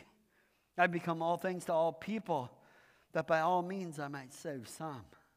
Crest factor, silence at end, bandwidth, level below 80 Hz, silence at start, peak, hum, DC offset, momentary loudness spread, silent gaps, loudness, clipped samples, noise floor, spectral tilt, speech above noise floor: 24 dB; 0.3 s; 15.5 kHz; -80 dBFS; 0.75 s; -14 dBFS; none; under 0.1%; 13 LU; none; -36 LUFS; under 0.1%; -74 dBFS; -5.5 dB/octave; 38 dB